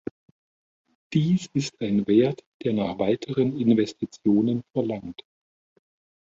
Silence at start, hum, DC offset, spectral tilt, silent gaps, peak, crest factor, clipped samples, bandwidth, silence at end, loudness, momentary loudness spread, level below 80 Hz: 1.1 s; none; under 0.1%; -7 dB/octave; 2.46-2.60 s; -8 dBFS; 18 dB; under 0.1%; 7.8 kHz; 1.1 s; -24 LUFS; 9 LU; -62 dBFS